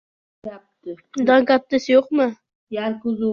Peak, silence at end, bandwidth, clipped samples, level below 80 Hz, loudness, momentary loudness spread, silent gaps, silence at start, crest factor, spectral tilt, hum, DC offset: -4 dBFS; 0 s; 7 kHz; under 0.1%; -64 dBFS; -19 LUFS; 21 LU; 2.55-2.67 s; 0.45 s; 16 dB; -5.5 dB/octave; none; under 0.1%